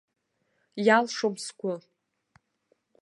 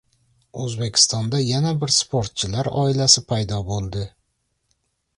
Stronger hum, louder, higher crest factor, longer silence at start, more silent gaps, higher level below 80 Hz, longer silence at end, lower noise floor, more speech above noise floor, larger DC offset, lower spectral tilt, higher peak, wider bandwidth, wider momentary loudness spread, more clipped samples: neither; second, -26 LUFS vs -19 LUFS; about the same, 24 dB vs 22 dB; first, 0.75 s vs 0.55 s; neither; second, -84 dBFS vs -46 dBFS; first, 1.25 s vs 1.1 s; about the same, -74 dBFS vs -72 dBFS; about the same, 48 dB vs 51 dB; neither; about the same, -4 dB/octave vs -3.5 dB/octave; second, -6 dBFS vs 0 dBFS; about the same, 11.5 kHz vs 11.5 kHz; about the same, 16 LU vs 14 LU; neither